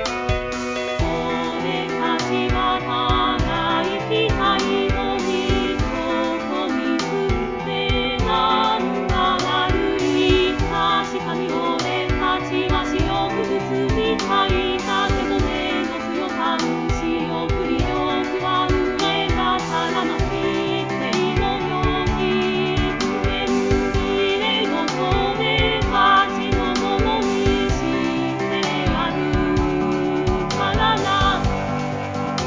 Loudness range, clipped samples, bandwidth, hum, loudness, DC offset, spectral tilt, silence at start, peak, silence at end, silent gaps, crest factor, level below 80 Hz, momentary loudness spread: 3 LU; under 0.1%; 7.6 kHz; none; -20 LUFS; 0.2%; -5.5 dB/octave; 0 s; -4 dBFS; 0 s; none; 16 dB; -32 dBFS; 5 LU